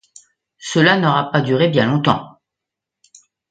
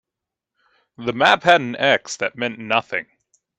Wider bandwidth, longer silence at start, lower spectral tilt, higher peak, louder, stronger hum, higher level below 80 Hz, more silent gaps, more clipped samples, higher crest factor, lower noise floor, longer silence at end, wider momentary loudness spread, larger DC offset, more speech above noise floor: second, 9.2 kHz vs 10.5 kHz; second, 0.6 s vs 1 s; first, -5.5 dB/octave vs -3.5 dB/octave; about the same, 0 dBFS vs 0 dBFS; first, -16 LUFS vs -19 LUFS; neither; first, -56 dBFS vs -64 dBFS; neither; neither; about the same, 18 dB vs 22 dB; about the same, -83 dBFS vs -85 dBFS; first, 1.2 s vs 0.55 s; second, 9 LU vs 13 LU; neither; about the same, 68 dB vs 66 dB